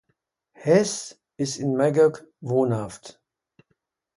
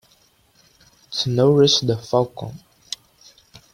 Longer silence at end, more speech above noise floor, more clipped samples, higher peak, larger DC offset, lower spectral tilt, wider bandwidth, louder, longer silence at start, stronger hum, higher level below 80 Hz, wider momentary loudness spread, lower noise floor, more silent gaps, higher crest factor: about the same, 1.05 s vs 1.15 s; first, 52 dB vs 40 dB; neither; about the same, -6 dBFS vs -4 dBFS; neither; about the same, -5.5 dB/octave vs -5.5 dB/octave; second, 11.5 kHz vs 15 kHz; second, -23 LUFS vs -18 LUFS; second, 0.6 s vs 1.1 s; neither; second, -64 dBFS vs -58 dBFS; about the same, 18 LU vs 19 LU; first, -74 dBFS vs -58 dBFS; neither; about the same, 20 dB vs 18 dB